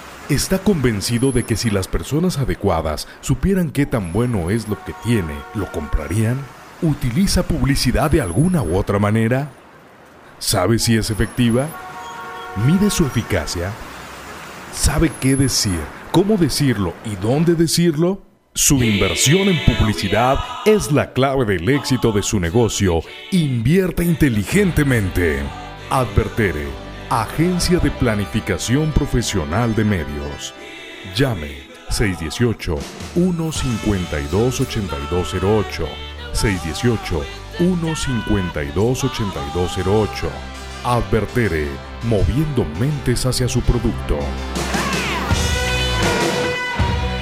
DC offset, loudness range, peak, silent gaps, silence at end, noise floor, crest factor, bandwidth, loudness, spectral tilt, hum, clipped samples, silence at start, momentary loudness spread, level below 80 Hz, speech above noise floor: under 0.1%; 5 LU; 0 dBFS; none; 0 s; -44 dBFS; 18 dB; 16 kHz; -19 LUFS; -5 dB/octave; none; under 0.1%; 0 s; 10 LU; -30 dBFS; 26 dB